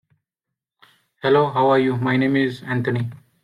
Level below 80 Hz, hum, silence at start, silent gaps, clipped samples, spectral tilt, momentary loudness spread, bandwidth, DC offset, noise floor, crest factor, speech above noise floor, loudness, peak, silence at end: -62 dBFS; none; 1.25 s; none; under 0.1%; -8 dB/octave; 9 LU; 11 kHz; under 0.1%; -85 dBFS; 16 dB; 66 dB; -20 LUFS; -4 dBFS; 0.25 s